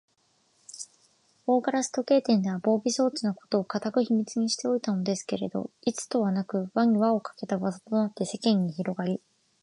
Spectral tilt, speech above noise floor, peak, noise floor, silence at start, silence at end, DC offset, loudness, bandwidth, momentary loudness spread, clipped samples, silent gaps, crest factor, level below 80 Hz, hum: -5.5 dB/octave; 42 dB; -10 dBFS; -69 dBFS; 0.75 s; 0.45 s; under 0.1%; -27 LUFS; 11.5 kHz; 8 LU; under 0.1%; none; 16 dB; -74 dBFS; none